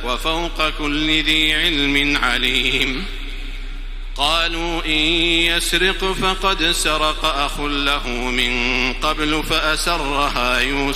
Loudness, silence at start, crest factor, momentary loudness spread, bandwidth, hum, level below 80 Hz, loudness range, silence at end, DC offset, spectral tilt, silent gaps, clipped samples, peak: -17 LUFS; 0 s; 16 dB; 7 LU; 16 kHz; none; -26 dBFS; 2 LU; 0 s; under 0.1%; -2.5 dB/octave; none; under 0.1%; -2 dBFS